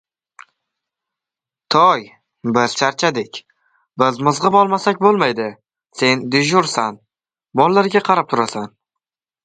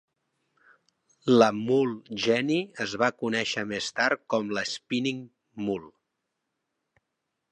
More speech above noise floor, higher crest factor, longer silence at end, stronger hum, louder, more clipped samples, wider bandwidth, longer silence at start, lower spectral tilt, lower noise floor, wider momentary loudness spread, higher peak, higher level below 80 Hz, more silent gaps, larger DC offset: first, 72 dB vs 56 dB; about the same, 18 dB vs 22 dB; second, 0.75 s vs 1.65 s; neither; first, -16 LUFS vs -27 LUFS; neither; about the same, 9.4 kHz vs 10 kHz; first, 1.7 s vs 1.25 s; about the same, -4.5 dB/octave vs -4.5 dB/octave; first, -88 dBFS vs -82 dBFS; about the same, 14 LU vs 12 LU; first, 0 dBFS vs -6 dBFS; first, -64 dBFS vs -72 dBFS; neither; neither